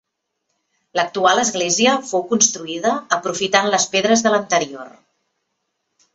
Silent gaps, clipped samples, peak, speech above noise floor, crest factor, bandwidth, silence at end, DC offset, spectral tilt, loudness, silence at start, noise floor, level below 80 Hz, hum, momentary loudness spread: none; under 0.1%; 0 dBFS; 57 dB; 18 dB; 8.4 kHz; 1.25 s; under 0.1%; -2 dB/octave; -17 LUFS; 0.95 s; -75 dBFS; -64 dBFS; none; 7 LU